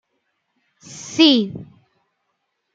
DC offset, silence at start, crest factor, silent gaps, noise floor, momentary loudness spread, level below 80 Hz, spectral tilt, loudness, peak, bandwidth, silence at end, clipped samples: under 0.1%; 0.9 s; 20 dB; none; -73 dBFS; 24 LU; -66 dBFS; -4 dB/octave; -16 LUFS; -2 dBFS; 7.8 kHz; 1.1 s; under 0.1%